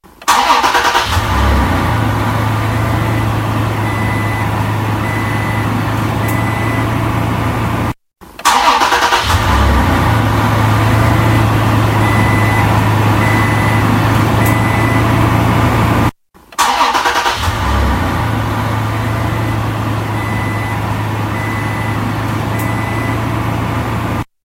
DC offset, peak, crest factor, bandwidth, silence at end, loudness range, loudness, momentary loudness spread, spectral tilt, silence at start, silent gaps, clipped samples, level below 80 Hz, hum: under 0.1%; 0 dBFS; 14 dB; 16 kHz; 0.2 s; 5 LU; -14 LUFS; 6 LU; -5.5 dB/octave; 0.2 s; none; under 0.1%; -24 dBFS; none